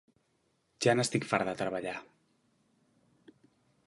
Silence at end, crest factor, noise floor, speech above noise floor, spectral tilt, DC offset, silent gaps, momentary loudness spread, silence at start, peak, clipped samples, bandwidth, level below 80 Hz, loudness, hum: 1.85 s; 24 dB; -75 dBFS; 44 dB; -4.5 dB/octave; under 0.1%; none; 11 LU; 0.8 s; -10 dBFS; under 0.1%; 11.5 kHz; -72 dBFS; -31 LUFS; none